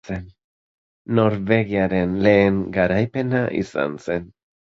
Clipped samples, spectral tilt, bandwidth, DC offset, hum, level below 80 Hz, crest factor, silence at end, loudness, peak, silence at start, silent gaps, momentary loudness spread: under 0.1%; -8 dB/octave; 7.8 kHz; under 0.1%; none; -46 dBFS; 18 dB; 0.4 s; -20 LUFS; -2 dBFS; 0.05 s; 0.44-1.05 s; 11 LU